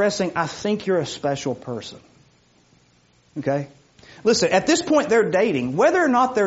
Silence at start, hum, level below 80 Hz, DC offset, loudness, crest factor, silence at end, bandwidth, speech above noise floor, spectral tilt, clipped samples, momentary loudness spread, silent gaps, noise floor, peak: 0 s; none; -60 dBFS; under 0.1%; -21 LUFS; 16 dB; 0 s; 8 kHz; 38 dB; -4 dB/octave; under 0.1%; 13 LU; none; -58 dBFS; -4 dBFS